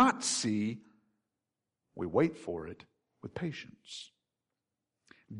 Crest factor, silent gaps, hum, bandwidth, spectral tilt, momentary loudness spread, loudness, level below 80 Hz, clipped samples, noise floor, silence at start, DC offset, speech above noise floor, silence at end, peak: 22 dB; none; none; 11 kHz; -4 dB/octave; 20 LU; -33 LUFS; -68 dBFS; under 0.1%; -89 dBFS; 0 s; under 0.1%; 54 dB; 0 s; -14 dBFS